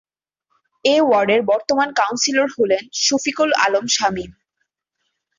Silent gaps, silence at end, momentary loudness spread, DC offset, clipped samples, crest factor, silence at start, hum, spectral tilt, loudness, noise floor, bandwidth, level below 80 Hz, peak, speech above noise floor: none; 1.1 s; 5 LU; under 0.1%; under 0.1%; 18 dB; 0.85 s; none; -2 dB/octave; -17 LUFS; -75 dBFS; 7.6 kHz; -58 dBFS; -2 dBFS; 57 dB